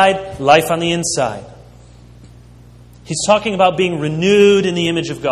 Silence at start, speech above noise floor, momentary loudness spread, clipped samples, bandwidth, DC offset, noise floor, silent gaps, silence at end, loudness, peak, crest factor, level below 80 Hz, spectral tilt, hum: 0 s; 27 dB; 9 LU; under 0.1%; 13.5 kHz; under 0.1%; -41 dBFS; none; 0 s; -15 LUFS; 0 dBFS; 16 dB; -46 dBFS; -4 dB/octave; 60 Hz at -40 dBFS